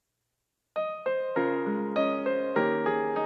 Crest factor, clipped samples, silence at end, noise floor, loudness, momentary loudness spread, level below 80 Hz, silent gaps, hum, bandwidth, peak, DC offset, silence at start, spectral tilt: 16 dB; under 0.1%; 0 s; -81 dBFS; -29 LUFS; 6 LU; -82 dBFS; none; none; 6.2 kHz; -12 dBFS; under 0.1%; 0.75 s; -8 dB/octave